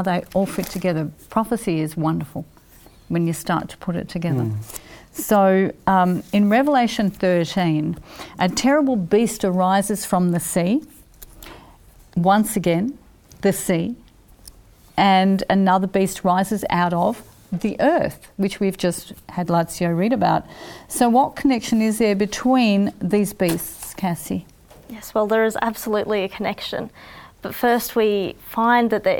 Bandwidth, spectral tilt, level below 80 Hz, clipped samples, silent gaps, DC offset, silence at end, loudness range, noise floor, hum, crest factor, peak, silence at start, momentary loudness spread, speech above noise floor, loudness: 20 kHz; -5.5 dB/octave; -50 dBFS; under 0.1%; none; under 0.1%; 0 s; 5 LU; -48 dBFS; none; 16 dB; -4 dBFS; 0 s; 13 LU; 29 dB; -20 LUFS